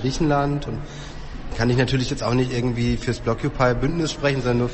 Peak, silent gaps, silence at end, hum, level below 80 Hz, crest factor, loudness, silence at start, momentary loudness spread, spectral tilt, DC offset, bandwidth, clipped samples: -4 dBFS; none; 0 s; none; -36 dBFS; 16 dB; -22 LUFS; 0 s; 13 LU; -6 dB/octave; under 0.1%; 8.4 kHz; under 0.1%